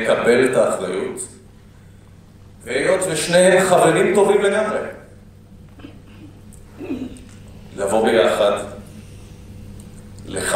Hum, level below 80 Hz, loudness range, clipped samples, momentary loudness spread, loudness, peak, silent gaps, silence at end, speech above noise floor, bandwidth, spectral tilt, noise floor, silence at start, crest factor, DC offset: none; -48 dBFS; 9 LU; under 0.1%; 25 LU; -17 LUFS; 0 dBFS; none; 0 s; 28 dB; 16 kHz; -4 dB/octave; -44 dBFS; 0 s; 18 dB; under 0.1%